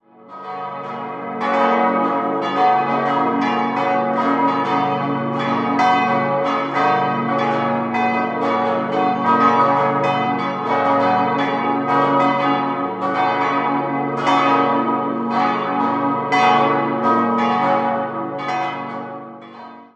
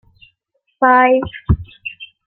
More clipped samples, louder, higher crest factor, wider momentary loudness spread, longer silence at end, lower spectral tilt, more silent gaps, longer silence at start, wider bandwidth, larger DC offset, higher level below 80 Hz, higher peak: neither; second, -18 LUFS vs -15 LUFS; about the same, 16 dB vs 16 dB; second, 9 LU vs 18 LU; about the same, 0.1 s vs 0.2 s; second, -6.5 dB/octave vs -11.5 dB/octave; neither; second, 0.25 s vs 0.8 s; first, 8.4 kHz vs 4.5 kHz; neither; second, -70 dBFS vs -32 dBFS; about the same, -2 dBFS vs -2 dBFS